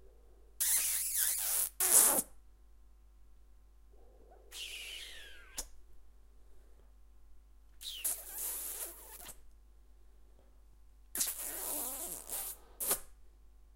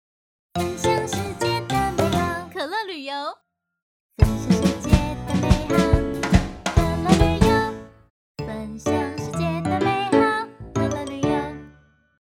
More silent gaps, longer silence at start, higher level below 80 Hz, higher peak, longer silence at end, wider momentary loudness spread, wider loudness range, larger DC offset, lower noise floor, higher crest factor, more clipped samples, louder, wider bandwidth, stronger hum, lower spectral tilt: second, none vs 3.82-4.10 s, 8.10-8.35 s; second, 0 s vs 0.55 s; second, -60 dBFS vs -30 dBFS; second, -6 dBFS vs 0 dBFS; second, 0.1 s vs 0.5 s; first, 22 LU vs 11 LU; first, 18 LU vs 4 LU; neither; about the same, -59 dBFS vs -57 dBFS; first, 34 dB vs 22 dB; neither; second, -33 LUFS vs -22 LUFS; about the same, 16 kHz vs 17 kHz; neither; second, 0.5 dB/octave vs -6 dB/octave